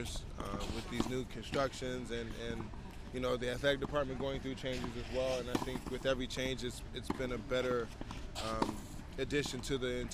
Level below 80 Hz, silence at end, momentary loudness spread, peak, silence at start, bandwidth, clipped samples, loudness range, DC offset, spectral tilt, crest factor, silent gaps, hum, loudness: -48 dBFS; 0 s; 9 LU; -18 dBFS; 0 s; 15.5 kHz; under 0.1%; 2 LU; under 0.1%; -5 dB/octave; 20 dB; none; none; -39 LUFS